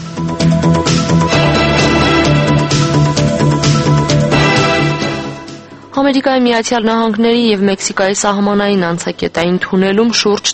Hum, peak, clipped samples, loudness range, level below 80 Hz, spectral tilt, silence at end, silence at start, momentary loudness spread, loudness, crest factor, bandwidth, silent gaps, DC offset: none; 0 dBFS; under 0.1%; 2 LU; -32 dBFS; -5 dB/octave; 0 s; 0 s; 7 LU; -12 LUFS; 12 dB; 8.8 kHz; none; under 0.1%